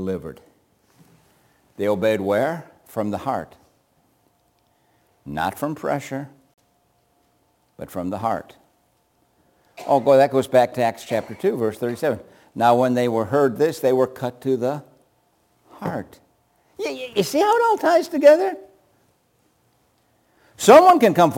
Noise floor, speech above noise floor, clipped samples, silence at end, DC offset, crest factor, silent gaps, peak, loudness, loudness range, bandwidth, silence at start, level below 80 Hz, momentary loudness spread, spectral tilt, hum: -64 dBFS; 45 dB; under 0.1%; 0 s; under 0.1%; 22 dB; none; 0 dBFS; -19 LUFS; 11 LU; 17 kHz; 0 s; -62 dBFS; 18 LU; -5.5 dB/octave; none